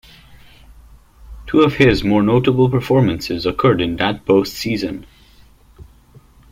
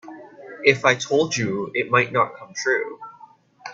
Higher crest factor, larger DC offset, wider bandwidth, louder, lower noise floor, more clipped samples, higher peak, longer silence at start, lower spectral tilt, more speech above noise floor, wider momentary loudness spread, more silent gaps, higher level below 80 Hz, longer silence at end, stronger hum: second, 16 dB vs 22 dB; neither; first, 16.5 kHz vs 7.8 kHz; first, -16 LUFS vs -21 LUFS; about the same, -47 dBFS vs -49 dBFS; neither; about the same, -2 dBFS vs 0 dBFS; first, 0.7 s vs 0.05 s; first, -7 dB/octave vs -4 dB/octave; first, 32 dB vs 28 dB; second, 9 LU vs 23 LU; neither; first, -40 dBFS vs -64 dBFS; first, 0.7 s vs 0 s; neither